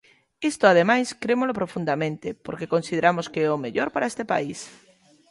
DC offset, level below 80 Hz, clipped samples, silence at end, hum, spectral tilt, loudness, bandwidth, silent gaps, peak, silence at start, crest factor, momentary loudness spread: under 0.1%; -64 dBFS; under 0.1%; 0.6 s; none; -5 dB/octave; -24 LUFS; 11.5 kHz; none; -2 dBFS; 0.4 s; 22 dB; 15 LU